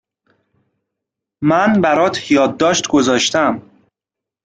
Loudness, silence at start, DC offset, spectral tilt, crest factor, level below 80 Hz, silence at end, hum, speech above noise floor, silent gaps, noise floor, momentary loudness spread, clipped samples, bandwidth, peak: -14 LUFS; 1.4 s; under 0.1%; -4 dB/octave; 16 dB; -54 dBFS; 0.85 s; none; 71 dB; none; -85 dBFS; 5 LU; under 0.1%; 9.4 kHz; -2 dBFS